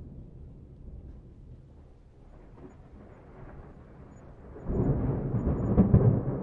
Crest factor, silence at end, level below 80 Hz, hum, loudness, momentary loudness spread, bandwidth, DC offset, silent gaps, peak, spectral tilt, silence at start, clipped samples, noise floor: 24 dB; 0 s; -40 dBFS; none; -26 LUFS; 28 LU; 2.8 kHz; under 0.1%; none; -8 dBFS; -12.5 dB/octave; 0 s; under 0.1%; -53 dBFS